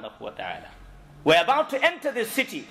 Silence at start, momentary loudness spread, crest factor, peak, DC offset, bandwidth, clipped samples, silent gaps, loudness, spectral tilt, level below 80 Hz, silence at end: 0 s; 16 LU; 18 dB; -8 dBFS; under 0.1%; 16 kHz; under 0.1%; none; -23 LUFS; -3.5 dB/octave; -56 dBFS; 0 s